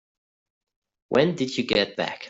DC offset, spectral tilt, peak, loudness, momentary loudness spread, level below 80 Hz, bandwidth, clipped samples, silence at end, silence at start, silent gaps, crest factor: under 0.1%; -5 dB/octave; -6 dBFS; -24 LUFS; 5 LU; -60 dBFS; 8 kHz; under 0.1%; 0 s; 1.1 s; none; 20 dB